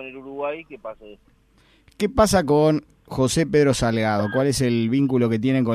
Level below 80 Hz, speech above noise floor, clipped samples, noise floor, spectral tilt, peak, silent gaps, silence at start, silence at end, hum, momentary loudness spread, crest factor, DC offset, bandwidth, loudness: -42 dBFS; 37 dB; under 0.1%; -57 dBFS; -5.5 dB/octave; -6 dBFS; none; 0 s; 0 s; none; 15 LU; 16 dB; under 0.1%; 15.5 kHz; -20 LUFS